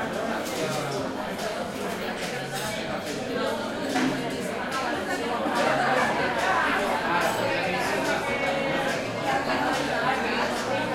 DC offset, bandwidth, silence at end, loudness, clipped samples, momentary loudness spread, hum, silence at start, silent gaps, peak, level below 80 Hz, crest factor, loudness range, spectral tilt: under 0.1%; 16.5 kHz; 0 s; -26 LUFS; under 0.1%; 7 LU; none; 0 s; none; -10 dBFS; -56 dBFS; 16 dB; 5 LU; -4 dB/octave